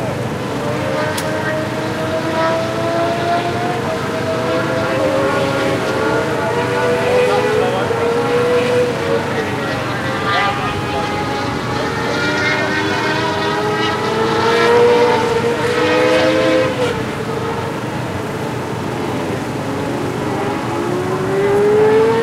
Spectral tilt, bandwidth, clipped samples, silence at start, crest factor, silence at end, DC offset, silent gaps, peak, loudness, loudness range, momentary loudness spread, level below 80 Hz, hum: -5 dB/octave; 16 kHz; under 0.1%; 0 s; 14 dB; 0 s; under 0.1%; none; -2 dBFS; -16 LUFS; 6 LU; 8 LU; -46 dBFS; none